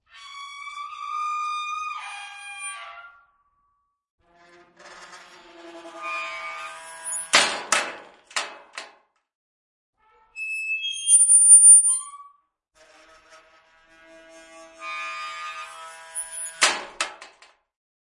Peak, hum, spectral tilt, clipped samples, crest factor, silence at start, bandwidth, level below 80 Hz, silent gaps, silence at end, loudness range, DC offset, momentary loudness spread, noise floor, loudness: -2 dBFS; none; 3 dB/octave; under 0.1%; 22 dB; 0.2 s; 11.5 kHz; -74 dBFS; 4.10-4.18 s, 9.35-9.93 s; 0.9 s; 23 LU; under 0.1%; 26 LU; -72 dBFS; -17 LUFS